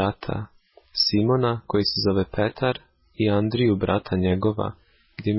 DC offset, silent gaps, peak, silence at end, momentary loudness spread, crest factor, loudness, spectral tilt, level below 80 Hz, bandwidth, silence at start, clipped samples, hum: under 0.1%; none; -10 dBFS; 0 s; 11 LU; 14 dB; -23 LUFS; -9 dB/octave; -44 dBFS; 5.8 kHz; 0 s; under 0.1%; none